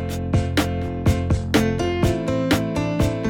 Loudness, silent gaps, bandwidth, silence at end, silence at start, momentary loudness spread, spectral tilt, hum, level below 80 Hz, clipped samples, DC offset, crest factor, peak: -21 LUFS; none; 18.5 kHz; 0 s; 0 s; 3 LU; -6 dB/octave; none; -34 dBFS; under 0.1%; under 0.1%; 18 dB; -4 dBFS